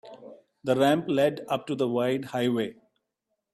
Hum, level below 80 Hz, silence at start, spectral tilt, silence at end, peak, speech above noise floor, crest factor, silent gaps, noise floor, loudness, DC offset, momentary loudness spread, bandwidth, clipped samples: none; -70 dBFS; 0.05 s; -6 dB/octave; 0.8 s; -10 dBFS; 56 dB; 18 dB; none; -81 dBFS; -27 LUFS; under 0.1%; 11 LU; 15 kHz; under 0.1%